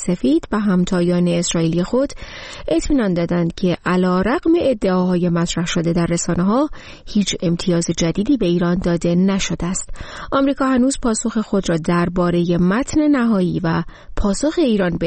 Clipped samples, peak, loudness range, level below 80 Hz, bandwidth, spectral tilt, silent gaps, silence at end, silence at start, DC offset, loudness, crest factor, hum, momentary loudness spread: under 0.1%; -6 dBFS; 1 LU; -34 dBFS; 8.8 kHz; -5.5 dB/octave; none; 0 s; 0 s; 0.2%; -18 LUFS; 12 dB; none; 6 LU